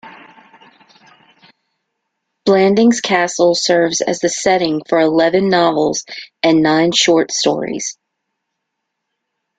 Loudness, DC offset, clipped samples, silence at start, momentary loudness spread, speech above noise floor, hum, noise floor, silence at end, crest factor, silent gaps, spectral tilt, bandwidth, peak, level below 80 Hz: -14 LUFS; under 0.1%; under 0.1%; 0.05 s; 8 LU; 62 dB; none; -75 dBFS; 1.65 s; 16 dB; none; -3.5 dB/octave; 9.4 kHz; 0 dBFS; -58 dBFS